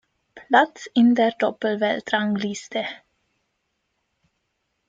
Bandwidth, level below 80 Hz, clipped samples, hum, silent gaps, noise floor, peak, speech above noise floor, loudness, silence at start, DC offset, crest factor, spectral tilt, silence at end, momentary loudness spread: 7.8 kHz; -70 dBFS; under 0.1%; none; none; -75 dBFS; -2 dBFS; 54 dB; -21 LUFS; 0.35 s; under 0.1%; 22 dB; -5 dB/octave; 1.95 s; 11 LU